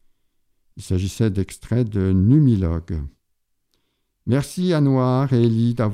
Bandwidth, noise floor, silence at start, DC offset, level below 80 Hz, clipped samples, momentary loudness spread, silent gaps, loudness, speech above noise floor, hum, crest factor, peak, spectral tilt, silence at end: 14 kHz; -70 dBFS; 0.75 s; under 0.1%; -42 dBFS; under 0.1%; 14 LU; none; -20 LUFS; 52 dB; none; 14 dB; -6 dBFS; -8 dB/octave; 0 s